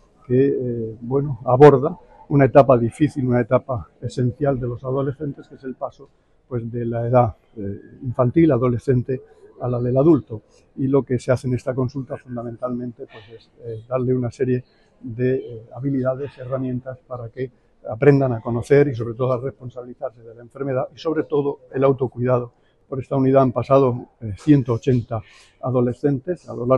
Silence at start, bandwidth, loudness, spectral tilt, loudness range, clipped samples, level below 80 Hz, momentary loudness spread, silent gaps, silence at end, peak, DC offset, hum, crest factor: 0.3 s; 10 kHz; -20 LUFS; -9 dB/octave; 9 LU; under 0.1%; -48 dBFS; 17 LU; none; 0 s; 0 dBFS; under 0.1%; none; 20 dB